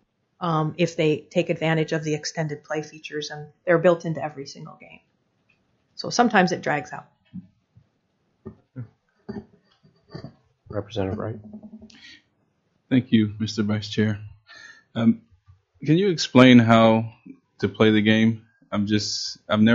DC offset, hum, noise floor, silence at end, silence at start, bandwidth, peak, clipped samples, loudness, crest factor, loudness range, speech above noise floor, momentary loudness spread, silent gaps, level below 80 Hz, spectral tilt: under 0.1%; none; -70 dBFS; 0 s; 0.4 s; 7.6 kHz; 0 dBFS; under 0.1%; -22 LUFS; 24 dB; 17 LU; 49 dB; 24 LU; none; -62 dBFS; -5 dB/octave